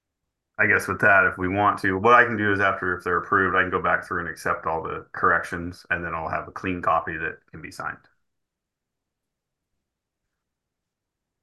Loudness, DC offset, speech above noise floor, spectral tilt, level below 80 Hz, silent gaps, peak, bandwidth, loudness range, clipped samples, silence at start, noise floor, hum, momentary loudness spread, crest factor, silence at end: -22 LUFS; under 0.1%; 61 dB; -5.5 dB/octave; -50 dBFS; none; -4 dBFS; 12.5 kHz; 17 LU; under 0.1%; 0.6 s; -84 dBFS; none; 16 LU; 22 dB; 3.45 s